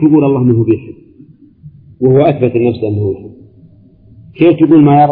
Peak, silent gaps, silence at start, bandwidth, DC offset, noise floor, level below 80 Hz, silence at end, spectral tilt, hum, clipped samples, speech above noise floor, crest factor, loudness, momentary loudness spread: 0 dBFS; none; 0 s; 4.3 kHz; under 0.1%; -42 dBFS; -48 dBFS; 0 s; -13 dB/octave; none; under 0.1%; 33 dB; 12 dB; -10 LUFS; 10 LU